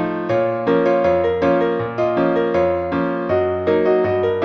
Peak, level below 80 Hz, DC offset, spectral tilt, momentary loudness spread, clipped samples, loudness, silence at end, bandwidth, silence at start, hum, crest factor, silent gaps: -4 dBFS; -48 dBFS; under 0.1%; -8.5 dB/octave; 4 LU; under 0.1%; -18 LUFS; 0 s; 6.2 kHz; 0 s; none; 12 dB; none